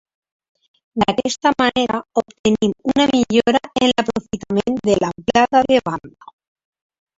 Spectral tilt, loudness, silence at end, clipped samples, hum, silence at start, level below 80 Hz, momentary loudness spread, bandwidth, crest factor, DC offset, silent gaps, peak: -4.5 dB/octave; -18 LUFS; 1.1 s; under 0.1%; none; 0.95 s; -50 dBFS; 8 LU; 7.8 kHz; 18 dB; under 0.1%; 2.39-2.44 s; 0 dBFS